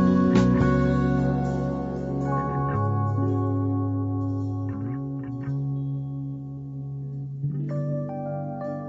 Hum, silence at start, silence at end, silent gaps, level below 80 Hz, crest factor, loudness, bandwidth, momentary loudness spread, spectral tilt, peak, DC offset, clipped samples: none; 0 s; 0 s; none; -42 dBFS; 18 dB; -26 LUFS; 7.6 kHz; 13 LU; -9 dB/octave; -8 dBFS; under 0.1%; under 0.1%